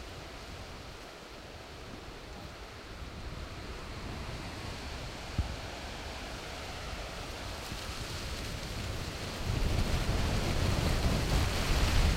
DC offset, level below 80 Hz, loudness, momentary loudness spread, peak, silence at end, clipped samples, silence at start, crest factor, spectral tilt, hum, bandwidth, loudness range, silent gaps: under 0.1%; -38 dBFS; -37 LUFS; 15 LU; -16 dBFS; 0 s; under 0.1%; 0 s; 18 dB; -4.5 dB/octave; none; 16 kHz; 12 LU; none